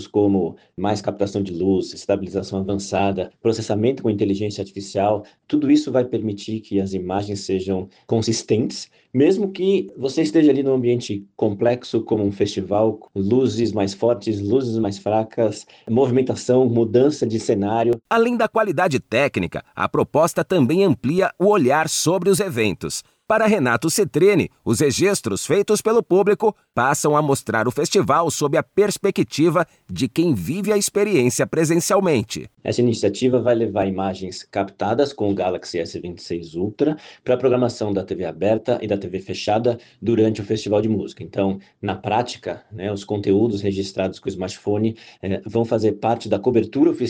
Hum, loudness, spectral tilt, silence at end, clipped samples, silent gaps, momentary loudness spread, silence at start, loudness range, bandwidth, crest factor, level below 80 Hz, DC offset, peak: none; -20 LUFS; -5.5 dB/octave; 0 s; under 0.1%; none; 9 LU; 0 s; 4 LU; 18 kHz; 16 dB; -56 dBFS; under 0.1%; -4 dBFS